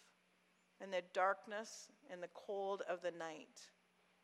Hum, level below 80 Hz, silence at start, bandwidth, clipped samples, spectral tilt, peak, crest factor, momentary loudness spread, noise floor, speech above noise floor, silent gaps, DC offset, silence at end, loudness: none; under -90 dBFS; 0.8 s; 13 kHz; under 0.1%; -3 dB/octave; -26 dBFS; 22 dB; 18 LU; -77 dBFS; 32 dB; none; under 0.1%; 0.55 s; -44 LUFS